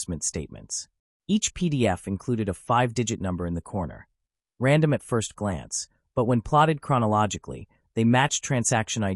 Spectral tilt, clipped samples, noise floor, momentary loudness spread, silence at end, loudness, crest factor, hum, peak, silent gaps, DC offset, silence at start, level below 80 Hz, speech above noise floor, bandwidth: -5 dB/octave; under 0.1%; -75 dBFS; 12 LU; 0 s; -25 LUFS; 18 dB; none; -8 dBFS; 0.99-1.20 s; under 0.1%; 0 s; -50 dBFS; 50 dB; 12 kHz